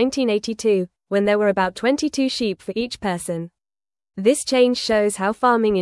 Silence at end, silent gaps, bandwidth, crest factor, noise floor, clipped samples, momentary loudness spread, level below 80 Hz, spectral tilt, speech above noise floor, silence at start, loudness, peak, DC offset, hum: 0 s; none; 12 kHz; 16 dB; under -90 dBFS; under 0.1%; 9 LU; -54 dBFS; -4.5 dB/octave; over 70 dB; 0 s; -20 LUFS; -4 dBFS; under 0.1%; none